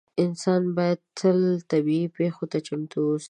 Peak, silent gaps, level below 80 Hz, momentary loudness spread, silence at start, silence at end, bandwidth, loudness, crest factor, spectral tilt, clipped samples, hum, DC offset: -8 dBFS; none; -74 dBFS; 7 LU; 0.15 s; 0 s; 10 kHz; -25 LUFS; 16 dB; -7 dB/octave; under 0.1%; none; under 0.1%